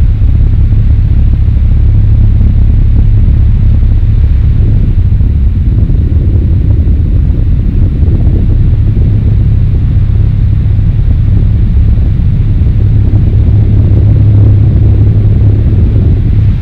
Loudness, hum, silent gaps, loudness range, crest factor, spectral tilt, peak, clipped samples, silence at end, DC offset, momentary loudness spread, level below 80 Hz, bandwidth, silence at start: -8 LUFS; none; none; 2 LU; 6 dB; -11 dB/octave; 0 dBFS; 3%; 0 s; 4%; 3 LU; -8 dBFS; 4.1 kHz; 0 s